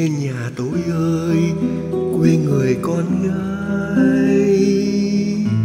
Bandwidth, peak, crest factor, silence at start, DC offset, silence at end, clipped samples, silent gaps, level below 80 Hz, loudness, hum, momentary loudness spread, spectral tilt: 13 kHz; -2 dBFS; 14 dB; 0 s; under 0.1%; 0 s; under 0.1%; none; -46 dBFS; -18 LUFS; none; 7 LU; -7.5 dB/octave